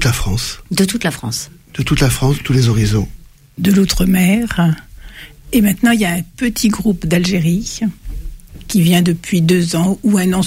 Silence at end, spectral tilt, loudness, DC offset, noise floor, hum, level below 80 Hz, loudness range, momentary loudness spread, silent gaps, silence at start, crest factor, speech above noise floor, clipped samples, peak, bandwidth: 0 s; -5.5 dB/octave; -15 LUFS; under 0.1%; -35 dBFS; none; -30 dBFS; 2 LU; 11 LU; none; 0 s; 12 dB; 21 dB; under 0.1%; -2 dBFS; 16.5 kHz